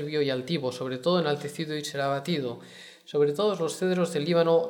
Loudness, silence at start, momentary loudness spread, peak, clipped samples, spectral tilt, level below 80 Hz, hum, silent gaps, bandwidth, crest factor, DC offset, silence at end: -28 LUFS; 0 s; 8 LU; -10 dBFS; under 0.1%; -5.5 dB/octave; -76 dBFS; none; none; 17.5 kHz; 16 dB; under 0.1%; 0 s